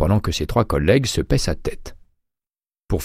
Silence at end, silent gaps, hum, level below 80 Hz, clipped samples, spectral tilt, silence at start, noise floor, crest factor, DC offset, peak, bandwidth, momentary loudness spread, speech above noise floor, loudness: 0 s; none; none; -30 dBFS; under 0.1%; -5.5 dB/octave; 0 s; under -90 dBFS; 18 dB; under 0.1%; -4 dBFS; 16 kHz; 11 LU; over 71 dB; -20 LUFS